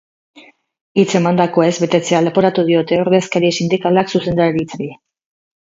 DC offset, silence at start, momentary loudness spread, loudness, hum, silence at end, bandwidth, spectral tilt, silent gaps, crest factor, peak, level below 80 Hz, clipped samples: under 0.1%; 0.35 s; 6 LU; -15 LUFS; none; 0.75 s; 7.8 kHz; -6 dB/octave; 0.81-0.95 s; 16 dB; 0 dBFS; -52 dBFS; under 0.1%